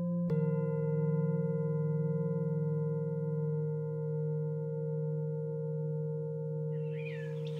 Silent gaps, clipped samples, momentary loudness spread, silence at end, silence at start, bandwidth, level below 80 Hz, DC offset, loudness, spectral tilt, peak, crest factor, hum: none; under 0.1%; 5 LU; 0 s; 0 s; 3.9 kHz; -76 dBFS; under 0.1%; -35 LUFS; -11.5 dB/octave; -22 dBFS; 12 dB; none